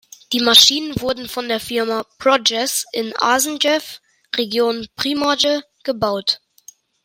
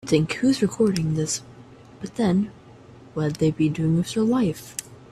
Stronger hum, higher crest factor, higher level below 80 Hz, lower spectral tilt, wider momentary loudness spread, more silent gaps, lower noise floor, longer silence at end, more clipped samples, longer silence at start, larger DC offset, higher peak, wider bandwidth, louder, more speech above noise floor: neither; about the same, 18 dB vs 18 dB; about the same, -54 dBFS vs -54 dBFS; second, -1.5 dB/octave vs -6 dB/octave; about the same, 12 LU vs 13 LU; neither; about the same, -47 dBFS vs -46 dBFS; first, 0.7 s vs 0.15 s; neither; first, 0.3 s vs 0.05 s; neither; first, 0 dBFS vs -6 dBFS; about the same, 16.5 kHz vs 15 kHz; first, -17 LUFS vs -23 LUFS; first, 29 dB vs 24 dB